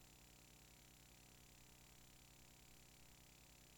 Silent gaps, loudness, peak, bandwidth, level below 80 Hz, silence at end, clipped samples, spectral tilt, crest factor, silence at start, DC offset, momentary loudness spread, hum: none; -65 LUFS; -52 dBFS; 19 kHz; -74 dBFS; 0 s; under 0.1%; -2.5 dB/octave; 14 dB; 0 s; under 0.1%; 0 LU; 60 Hz at -75 dBFS